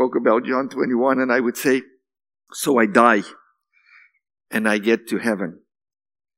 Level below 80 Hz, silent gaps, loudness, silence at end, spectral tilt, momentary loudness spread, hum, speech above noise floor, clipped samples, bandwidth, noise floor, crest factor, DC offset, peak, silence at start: -76 dBFS; none; -19 LUFS; 0.85 s; -4.5 dB/octave; 11 LU; none; 41 dB; under 0.1%; 16.5 kHz; -60 dBFS; 22 dB; under 0.1%; 0 dBFS; 0 s